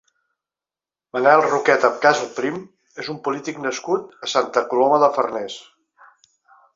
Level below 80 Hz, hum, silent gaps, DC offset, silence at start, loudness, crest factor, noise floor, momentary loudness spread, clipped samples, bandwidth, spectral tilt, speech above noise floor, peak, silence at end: -70 dBFS; none; none; under 0.1%; 1.15 s; -19 LUFS; 20 dB; under -90 dBFS; 16 LU; under 0.1%; 7.8 kHz; -3.5 dB/octave; over 71 dB; -2 dBFS; 1.15 s